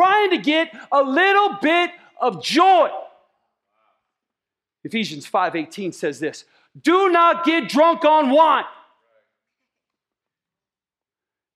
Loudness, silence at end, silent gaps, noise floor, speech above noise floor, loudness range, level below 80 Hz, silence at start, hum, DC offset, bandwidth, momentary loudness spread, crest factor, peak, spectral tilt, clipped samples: -18 LUFS; 2.85 s; none; under -90 dBFS; over 72 dB; 10 LU; -78 dBFS; 0 s; none; under 0.1%; 14.5 kHz; 12 LU; 16 dB; -4 dBFS; -4 dB/octave; under 0.1%